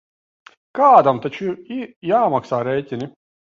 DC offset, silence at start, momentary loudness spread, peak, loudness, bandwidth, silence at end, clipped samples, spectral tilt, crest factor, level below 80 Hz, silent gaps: under 0.1%; 0.75 s; 18 LU; 0 dBFS; -18 LUFS; 7.2 kHz; 0.35 s; under 0.1%; -7.5 dB/octave; 18 dB; -64 dBFS; 1.96-2.02 s